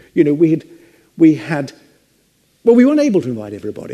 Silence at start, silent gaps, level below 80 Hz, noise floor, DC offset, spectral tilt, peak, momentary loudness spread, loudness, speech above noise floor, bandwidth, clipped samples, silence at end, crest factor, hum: 0.15 s; none; -62 dBFS; -58 dBFS; under 0.1%; -7.5 dB/octave; 0 dBFS; 15 LU; -14 LUFS; 45 dB; 9.8 kHz; under 0.1%; 0 s; 16 dB; none